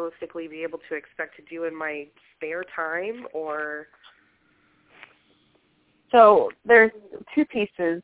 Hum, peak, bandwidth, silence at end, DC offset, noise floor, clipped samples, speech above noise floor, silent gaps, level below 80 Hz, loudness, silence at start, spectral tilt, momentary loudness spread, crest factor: none; -2 dBFS; 4 kHz; 0.05 s; under 0.1%; -65 dBFS; under 0.1%; 42 dB; none; -66 dBFS; -22 LUFS; 0 s; -8 dB/octave; 19 LU; 22 dB